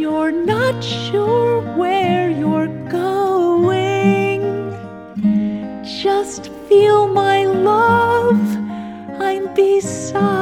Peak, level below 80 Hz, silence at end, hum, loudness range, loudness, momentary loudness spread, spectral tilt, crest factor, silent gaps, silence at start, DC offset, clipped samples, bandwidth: -2 dBFS; -54 dBFS; 0 s; none; 3 LU; -16 LUFS; 12 LU; -6 dB/octave; 14 dB; none; 0 s; under 0.1%; under 0.1%; 15.5 kHz